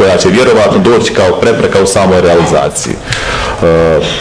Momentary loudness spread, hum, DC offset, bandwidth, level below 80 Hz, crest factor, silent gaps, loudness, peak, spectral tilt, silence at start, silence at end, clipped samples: 7 LU; none; under 0.1%; 11 kHz; -28 dBFS; 8 dB; none; -8 LUFS; 0 dBFS; -4.5 dB/octave; 0 s; 0 s; 0.2%